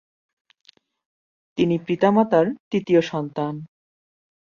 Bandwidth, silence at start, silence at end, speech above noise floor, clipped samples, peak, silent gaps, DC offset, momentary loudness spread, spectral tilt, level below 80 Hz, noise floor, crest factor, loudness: 7.2 kHz; 1.55 s; 0.85 s; over 70 dB; under 0.1%; -4 dBFS; 2.60-2.71 s; under 0.1%; 11 LU; -7.5 dB/octave; -64 dBFS; under -90 dBFS; 20 dB; -21 LUFS